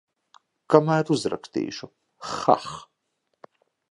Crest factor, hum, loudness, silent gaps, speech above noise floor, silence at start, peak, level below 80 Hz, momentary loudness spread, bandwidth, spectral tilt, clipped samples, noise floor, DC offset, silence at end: 26 dB; none; -24 LUFS; none; 53 dB; 0.7 s; 0 dBFS; -66 dBFS; 19 LU; 11.5 kHz; -6 dB/octave; under 0.1%; -76 dBFS; under 0.1%; 1.05 s